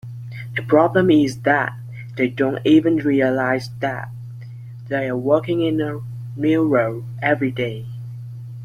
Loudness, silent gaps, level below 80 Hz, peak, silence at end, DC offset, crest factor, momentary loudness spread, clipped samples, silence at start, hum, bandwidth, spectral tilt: -19 LUFS; none; -56 dBFS; -2 dBFS; 0 s; under 0.1%; 18 dB; 18 LU; under 0.1%; 0.05 s; none; 11 kHz; -7.5 dB/octave